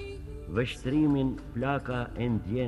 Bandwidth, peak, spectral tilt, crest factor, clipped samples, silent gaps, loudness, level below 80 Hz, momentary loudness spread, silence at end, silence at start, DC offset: 12 kHz; -14 dBFS; -7.5 dB/octave; 16 dB; under 0.1%; none; -30 LUFS; -44 dBFS; 8 LU; 0 s; 0 s; under 0.1%